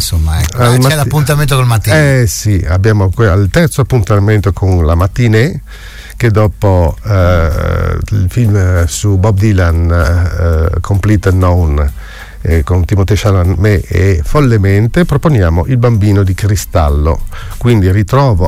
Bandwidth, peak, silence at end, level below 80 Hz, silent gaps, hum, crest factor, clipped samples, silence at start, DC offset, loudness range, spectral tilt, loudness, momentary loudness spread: 16 kHz; 0 dBFS; 0 s; -18 dBFS; none; none; 10 dB; under 0.1%; 0 s; 1%; 2 LU; -6.5 dB/octave; -10 LUFS; 5 LU